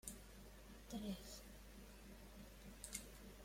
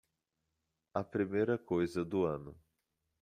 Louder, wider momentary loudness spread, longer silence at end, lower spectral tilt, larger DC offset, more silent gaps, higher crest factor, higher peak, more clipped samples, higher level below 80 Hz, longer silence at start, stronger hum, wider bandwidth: second, -55 LUFS vs -36 LUFS; about the same, 11 LU vs 9 LU; second, 0 s vs 0.7 s; second, -3.5 dB/octave vs -8 dB/octave; neither; neither; first, 26 dB vs 20 dB; second, -30 dBFS vs -18 dBFS; neither; first, -62 dBFS vs -68 dBFS; second, 0.05 s vs 0.95 s; first, 50 Hz at -60 dBFS vs none; first, 16.5 kHz vs 11 kHz